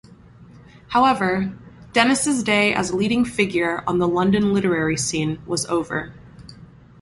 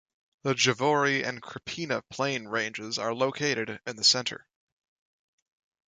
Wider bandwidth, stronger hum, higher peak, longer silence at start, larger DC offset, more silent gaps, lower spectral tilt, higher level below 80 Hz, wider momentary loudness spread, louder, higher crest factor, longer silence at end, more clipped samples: first, 12 kHz vs 9.6 kHz; neither; first, -2 dBFS vs -8 dBFS; second, 0.1 s vs 0.45 s; neither; neither; first, -4.5 dB/octave vs -3 dB/octave; first, -50 dBFS vs -70 dBFS; second, 7 LU vs 13 LU; first, -20 LUFS vs -27 LUFS; about the same, 20 dB vs 22 dB; second, 0.35 s vs 1.55 s; neither